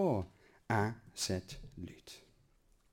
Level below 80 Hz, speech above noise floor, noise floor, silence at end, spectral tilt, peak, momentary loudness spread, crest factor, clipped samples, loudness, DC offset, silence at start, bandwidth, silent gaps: -60 dBFS; 33 dB; -69 dBFS; 0.75 s; -5 dB/octave; -20 dBFS; 19 LU; 20 dB; under 0.1%; -38 LUFS; under 0.1%; 0 s; 16.5 kHz; none